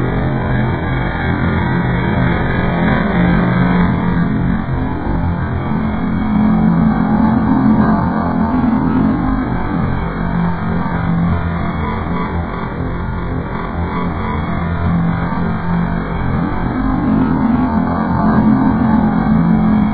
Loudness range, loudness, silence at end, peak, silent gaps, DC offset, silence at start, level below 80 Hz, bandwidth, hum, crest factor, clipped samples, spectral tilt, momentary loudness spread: 5 LU; -15 LUFS; 0 s; 0 dBFS; none; 1%; 0 s; -26 dBFS; 4.7 kHz; none; 14 dB; under 0.1%; -12 dB/octave; 7 LU